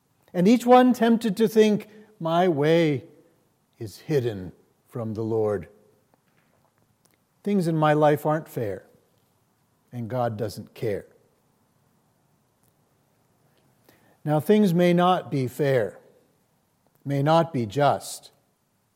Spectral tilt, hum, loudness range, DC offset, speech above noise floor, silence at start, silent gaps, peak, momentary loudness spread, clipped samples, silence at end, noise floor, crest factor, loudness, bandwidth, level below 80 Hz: -7 dB/octave; none; 11 LU; under 0.1%; 47 dB; 0.35 s; none; -6 dBFS; 17 LU; under 0.1%; 0.75 s; -69 dBFS; 20 dB; -23 LUFS; 16.5 kHz; -72 dBFS